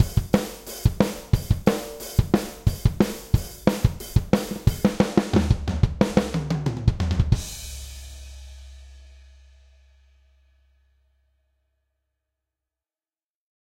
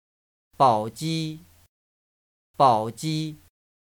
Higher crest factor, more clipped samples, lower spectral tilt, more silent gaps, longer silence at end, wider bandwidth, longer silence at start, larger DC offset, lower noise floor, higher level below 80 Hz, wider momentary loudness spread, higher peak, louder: about the same, 22 dB vs 22 dB; neither; about the same, -6.5 dB/octave vs -6 dB/octave; second, none vs 1.68-2.54 s; first, 4.6 s vs 0.55 s; second, 16.5 kHz vs 19.5 kHz; second, 0 s vs 0.6 s; neither; about the same, under -90 dBFS vs under -90 dBFS; first, -32 dBFS vs -64 dBFS; about the same, 15 LU vs 14 LU; about the same, -2 dBFS vs -4 dBFS; about the same, -24 LUFS vs -24 LUFS